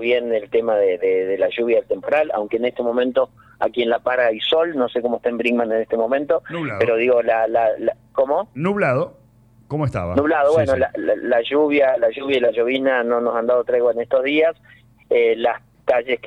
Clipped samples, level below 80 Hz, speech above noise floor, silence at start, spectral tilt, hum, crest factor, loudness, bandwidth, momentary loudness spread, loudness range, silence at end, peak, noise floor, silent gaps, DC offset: under 0.1%; -54 dBFS; 33 dB; 0 s; -7 dB/octave; none; 12 dB; -19 LUFS; 9.2 kHz; 6 LU; 2 LU; 0 s; -6 dBFS; -52 dBFS; none; under 0.1%